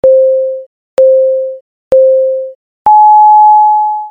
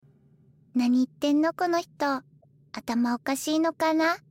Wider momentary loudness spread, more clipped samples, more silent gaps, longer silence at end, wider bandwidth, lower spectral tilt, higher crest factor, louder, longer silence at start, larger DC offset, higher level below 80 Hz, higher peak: first, 15 LU vs 8 LU; neither; first, 0.66-0.97 s, 1.61-1.91 s, 2.55-2.85 s vs none; second, 0 s vs 0.15 s; second, 3.6 kHz vs 16.5 kHz; first, -6 dB/octave vs -3.5 dB/octave; about the same, 8 dB vs 12 dB; first, -7 LUFS vs -26 LUFS; second, 0.05 s vs 0.75 s; neither; first, -52 dBFS vs -70 dBFS; first, 0 dBFS vs -14 dBFS